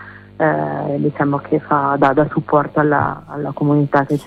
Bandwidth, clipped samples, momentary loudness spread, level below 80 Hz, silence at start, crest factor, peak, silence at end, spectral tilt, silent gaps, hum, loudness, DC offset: 5.8 kHz; under 0.1%; 7 LU; -50 dBFS; 0 s; 16 dB; -2 dBFS; 0 s; -9 dB/octave; none; none; -17 LUFS; under 0.1%